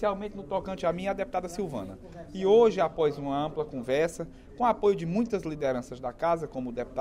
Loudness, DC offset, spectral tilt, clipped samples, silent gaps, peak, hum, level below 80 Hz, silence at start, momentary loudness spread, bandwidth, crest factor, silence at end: -29 LUFS; under 0.1%; -6.5 dB/octave; under 0.1%; none; -10 dBFS; none; -52 dBFS; 0 s; 13 LU; 12.5 kHz; 18 dB; 0 s